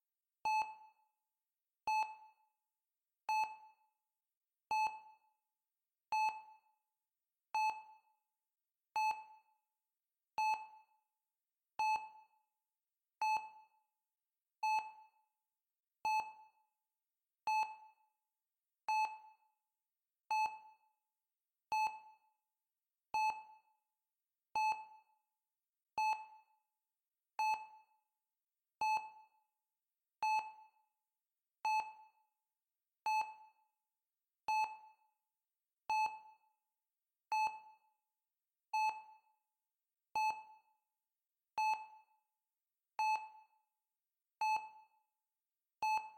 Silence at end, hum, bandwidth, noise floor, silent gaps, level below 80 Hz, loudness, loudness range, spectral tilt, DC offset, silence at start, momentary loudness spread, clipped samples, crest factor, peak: 0.05 s; none; 16.5 kHz; under -90 dBFS; 4.37-4.41 s; -88 dBFS; -40 LUFS; 2 LU; 0.5 dB/octave; under 0.1%; 0.45 s; 18 LU; under 0.1%; 14 dB; -30 dBFS